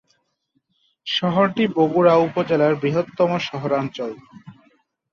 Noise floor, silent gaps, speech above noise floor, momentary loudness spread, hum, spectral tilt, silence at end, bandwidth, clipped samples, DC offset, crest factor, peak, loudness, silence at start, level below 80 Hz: -70 dBFS; none; 51 dB; 14 LU; none; -7 dB/octave; 0.6 s; 7 kHz; under 0.1%; under 0.1%; 18 dB; -4 dBFS; -20 LUFS; 1.05 s; -62 dBFS